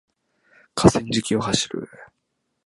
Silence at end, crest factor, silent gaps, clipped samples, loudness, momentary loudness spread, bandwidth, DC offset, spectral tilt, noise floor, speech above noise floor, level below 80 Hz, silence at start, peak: 0.6 s; 24 dB; none; under 0.1%; -21 LUFS; 15 LU; 11.5 kHz; under 0.1%; -4.5 dB/octave; -75 dBFS; 54 dB; -46 dBFS; 0.75 s; 0 dBFS